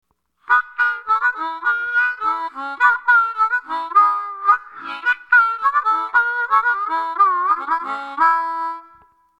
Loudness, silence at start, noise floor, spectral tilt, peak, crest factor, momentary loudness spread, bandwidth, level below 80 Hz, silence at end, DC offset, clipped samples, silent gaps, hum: -18 LUFS; 0.5 s; -52 dBFS; -1.5 dB/octave; -2 dBFS; 18 dB; 8 LU; 9.6 kHz; -64 dBFS; 0.6 s; under 0.1%; under 0.1%; none; none